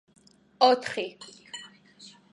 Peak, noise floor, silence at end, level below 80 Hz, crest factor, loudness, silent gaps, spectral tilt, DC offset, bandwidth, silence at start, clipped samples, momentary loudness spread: -6 dBFS; -53 dBFS; 0.65 s; -80 dBFS; 24 dB; -25 LUFS; none; -3 dB/octave; under 0.1%; 11.5 kHz; 0.6 s; under 0.1%; 20 LU